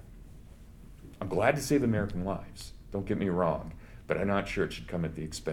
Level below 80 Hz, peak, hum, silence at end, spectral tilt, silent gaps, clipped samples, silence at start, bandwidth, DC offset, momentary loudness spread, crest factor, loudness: -48 dBFS; -10 dBFS; none; 0 s; -6 dB/octave; none; under 0.1%; 0 s; 17.5 kHz; under 0.1%; 19 LU; 22 dB; -31 LUFS